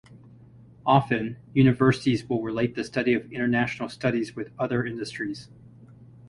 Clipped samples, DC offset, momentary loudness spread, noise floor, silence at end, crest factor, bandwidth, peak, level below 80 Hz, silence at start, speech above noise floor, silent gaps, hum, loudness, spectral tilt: under 0.1%; under 0.1%; 10 LU; -50 dBFS; 0 s; 20 dB; 11 kHz; -6 dBFS; -56 dBFS; 0.85 s; 26 dB; none; none; -25 LUFS; -7 dB/octave